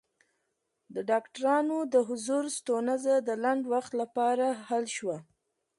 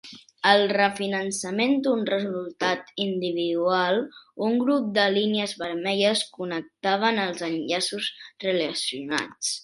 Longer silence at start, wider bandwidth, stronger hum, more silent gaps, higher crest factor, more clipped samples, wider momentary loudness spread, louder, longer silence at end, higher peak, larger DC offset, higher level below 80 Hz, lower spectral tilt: first, 0.9 s vs 0.05 s; about the same, 11.5 kHz vs 11.5 kHz; neither; neither; second, 16 dB vs 22 dB; neither; about the same, 7 LU vs 8 LU; second, -29 LUFS vs -25 LUFS; first, 0.55 s vs 0 s; second, -14 dBFS vs -4 dBFS; neither; second, -82 dBFS vs -72 dBFS; about the same, -4 dB/octave vs -3.5 dB/octave